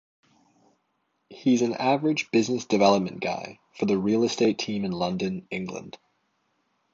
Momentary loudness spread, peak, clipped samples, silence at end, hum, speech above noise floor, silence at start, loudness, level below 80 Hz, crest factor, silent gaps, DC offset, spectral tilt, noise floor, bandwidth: 12 LU; -4 dBFS; under 0.1%; 1.05 s; none; 49 dB; 1.3 s; -25 LUFS; -64 dBFS; 22 dB; none; under 0.1%; -5.5 dB/octave; -74 dBFS; 7.8 kHz